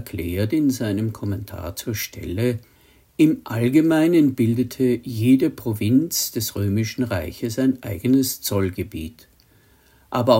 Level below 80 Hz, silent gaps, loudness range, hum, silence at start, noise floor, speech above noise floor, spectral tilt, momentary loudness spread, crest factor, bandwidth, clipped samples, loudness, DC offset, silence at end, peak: -52 dBFS; none; 5 LU; none; 0 s; -55 dBFS; 35 dB; -6 dB/octave; 11 LU; 20 dB; 16.5 kHz; under 0.1%; -21 LUFS; under 0.1%; 0 s; -2 dBFS